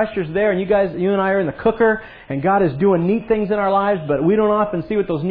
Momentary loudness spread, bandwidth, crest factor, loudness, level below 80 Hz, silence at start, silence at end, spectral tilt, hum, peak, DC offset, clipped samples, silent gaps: 5 LU; 4.8 kHz; 14 dB; -18 LUFS; -46 dBFS; 0 s; 0 s; -11 dB/octave; none; -4 dBFS; under 0.1%; under 0.1%; none